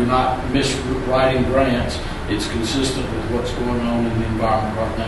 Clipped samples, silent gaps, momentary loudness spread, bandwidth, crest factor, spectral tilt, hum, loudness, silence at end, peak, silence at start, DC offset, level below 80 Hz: under 0.1%; none; 6 LU; 11.5 kHz; 16 dB; -5.5 dB/octave; none; -20 LUFS; 0 s; -4 dBFS; 0 s; under 0.1%; -30 dBFS